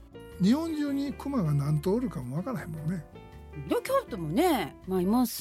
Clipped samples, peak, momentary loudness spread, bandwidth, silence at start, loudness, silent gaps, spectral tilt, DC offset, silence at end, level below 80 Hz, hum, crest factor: under 0.1%; -14 dBFS; 12 LU; 16.5 kHz; 0 s; -29 LUFS; none; -6.5 dB/octave; under 0.1%; 0 s; -50 dBFS; none; 14 dB